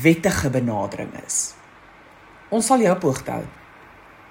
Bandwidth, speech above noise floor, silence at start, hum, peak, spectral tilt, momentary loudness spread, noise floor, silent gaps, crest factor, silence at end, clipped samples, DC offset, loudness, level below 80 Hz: 16.5 kHz; 27 dB; 0 s; none; -2 dBFS; -5 dB/octave; 13 LU; -47 dBFS; none; 20 dB; 0.8 s; under 0.1%; under 0.1%; -22 LUFS; -50 dBFS